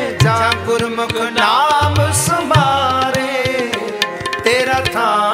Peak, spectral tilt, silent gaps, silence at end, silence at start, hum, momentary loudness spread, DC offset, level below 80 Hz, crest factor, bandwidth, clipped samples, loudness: 0 dBFS; -4 dB/octave; none; 0 s; 0 s; none; 6 LU; under 0.1%; -40 dBFS; 14 dB; 16 kHz; under 0.1%; -15 LUFS